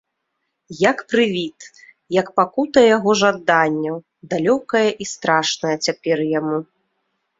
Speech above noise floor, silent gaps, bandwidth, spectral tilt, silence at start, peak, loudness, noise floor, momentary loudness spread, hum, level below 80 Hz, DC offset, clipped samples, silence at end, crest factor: 57 dB; none; 7.8 kHz; -4 dB/octave; 0.7 s; -2 dBFS; -18 LUFS; -75 dBFS; 11 LU; none; -62 dBFS; under 0.1%; under 0.1%; 0.75 s; 18 dB